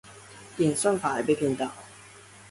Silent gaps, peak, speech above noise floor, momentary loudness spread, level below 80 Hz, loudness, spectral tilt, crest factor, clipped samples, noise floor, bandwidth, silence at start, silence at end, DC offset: none; -12 dBFS; 24 dB; 22 LU; -64 dBFS; -26 LUFS; -5 dB/octave; 18 dB; under 0.1%; -50 dBFS; 12 kHz; 0.05 s; 0 s; under 0.1%